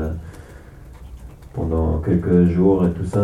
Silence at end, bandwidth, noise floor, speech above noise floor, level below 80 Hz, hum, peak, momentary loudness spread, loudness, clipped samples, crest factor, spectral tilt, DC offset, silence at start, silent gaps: 0 s; 10 kHz; -40 dBFS; 23 dB; -32 dBFS; none; -4 dBFS; 24 LU; -18 LUFS; under 0.1%; 16 dB; -10 dB/octave; under 0.1%; 0 s; none